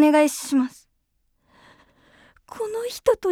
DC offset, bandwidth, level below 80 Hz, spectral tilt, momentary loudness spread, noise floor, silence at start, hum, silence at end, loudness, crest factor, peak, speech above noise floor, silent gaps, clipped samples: under 0.1%; 17 kHz; -60 dBFS; -3 dB/octave; 13 LU; -70 dBFS; 0 s; none; 0 s; -23 LUFS; 18 dB; -6 dBFS; 49 dB; none; under 0.1%